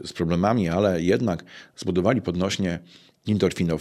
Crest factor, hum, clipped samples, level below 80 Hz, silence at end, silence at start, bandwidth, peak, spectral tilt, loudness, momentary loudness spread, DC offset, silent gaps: 18 dB; none; under 0.1%; -50 dBFS; 0 s; 0 s; 13 kHz; -6 dBFS; -6.5 dB/octave; -24 LUFS; 11 LU; under 0.1%; none